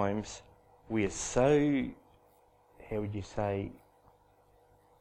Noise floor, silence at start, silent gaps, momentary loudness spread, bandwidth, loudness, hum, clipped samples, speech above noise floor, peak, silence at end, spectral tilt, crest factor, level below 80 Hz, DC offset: -65 dBFS; 0 s; none; 16 LU; 11 kHz; -32 LUFS; 50 Hz at -60 dBFS; under 0.1%; 34 dB; -14 dBFS; 1.25 s; -5.5 dB/octave; 20 dB; -54 dBFS; under 0.1%